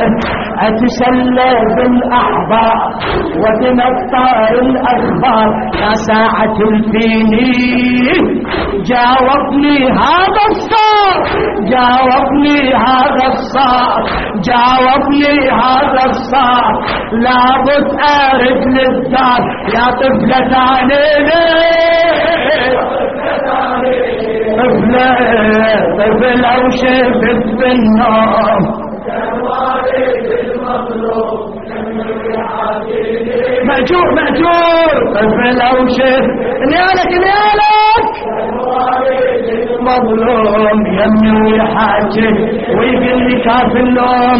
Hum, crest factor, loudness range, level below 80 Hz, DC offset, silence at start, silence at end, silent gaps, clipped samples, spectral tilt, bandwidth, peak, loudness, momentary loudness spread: none; 10 dB; 3 LU; -34 dBFS; 0.9%; 0 s; 0 s; none; under 0.1%; -3 dB/octave; 6.2 kHz; 0 dBFS; -10 LUFS; 7 LU